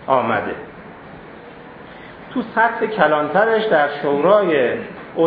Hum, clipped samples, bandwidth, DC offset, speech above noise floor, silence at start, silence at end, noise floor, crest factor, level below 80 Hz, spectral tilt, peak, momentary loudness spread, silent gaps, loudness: none; under 0.1%; 5 kHz; under 0.1%; 21 dB; 0 s; 0 s; -38 dBFS; 18 dB; -56 dBFS; -9 dB/octave; 0 dBFS; 23 LU; none; -17 LUFS